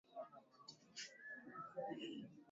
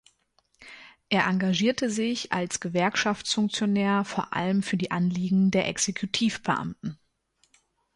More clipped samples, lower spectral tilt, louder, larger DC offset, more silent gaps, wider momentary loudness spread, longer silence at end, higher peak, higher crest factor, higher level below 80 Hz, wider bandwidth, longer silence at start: neither; second, -2.5 dB/octave vs -4.5 dB/octave; second, -53 LUFS vs -26 LUFS; neither; neither; first, 12 LU vs 6 LU; second, 0 s vs 1 s; second, -36 dBFS vs -8 dBFS; about the same, 18 dB vs 18 dB; second, under -90 dBFS vs -62 dBFS; second, 7.6 kHz vs 11.5 kHz; second, 0.05 s vs 0.6 s